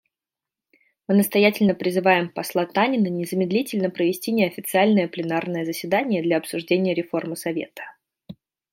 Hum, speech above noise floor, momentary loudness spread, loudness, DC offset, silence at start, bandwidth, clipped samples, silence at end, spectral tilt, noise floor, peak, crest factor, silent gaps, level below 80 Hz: none; 67 dB; 9 LU; -22 LUFS; under 0.1%; 1.1 s; 16.5 kHz; under 0.1%; 0.4 s; -5.5 dB/octave; -89 dBFS; -4 dBFS; 20 dB; none; -70 dBFS